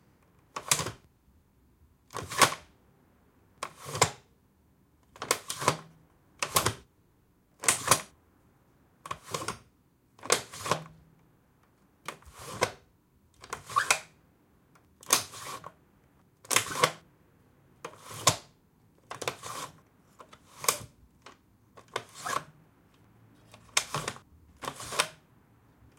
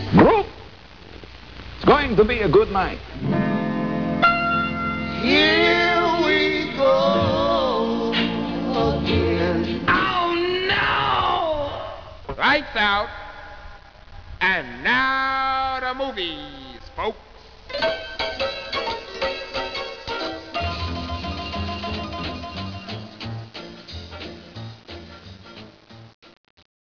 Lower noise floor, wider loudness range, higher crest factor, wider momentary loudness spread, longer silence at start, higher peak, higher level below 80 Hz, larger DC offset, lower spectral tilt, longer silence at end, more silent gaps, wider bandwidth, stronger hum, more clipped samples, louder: first, -66 dBFS vs -45 dBFS; second, 6 LU vs 13 LU; first, 30 dB vs 18 dB; about the same, 20 LU vs 21 LU; first, 0.55 s vs 0 s; about the same, -6 dBFS vs -4 dBFS; second, -66 dBFS vs -42 dBFS; second, under 0.1% vs 0.3%; second, -1.5 dB/octave vs -6 dB/octave; first, 0.85 s vs 0.7 s; second, none vs 26.14-26.22 s; first, 16.5 kHz vs 5.4 kHz; neither; neither; second, -30 LUFS vs -21 LUFS